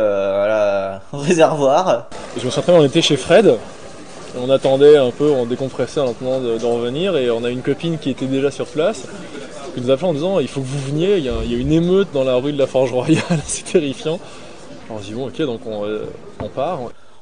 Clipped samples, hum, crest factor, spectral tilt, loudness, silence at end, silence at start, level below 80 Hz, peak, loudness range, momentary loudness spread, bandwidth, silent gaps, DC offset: under 0.1%; none; 18 dB; -5.5 dB/octave; -17 LUFS; 0.3 s; 0 s; -42 dBFS; 0 dBFS; 6 LU; 18 LU; 10.5 kHz; none; 1%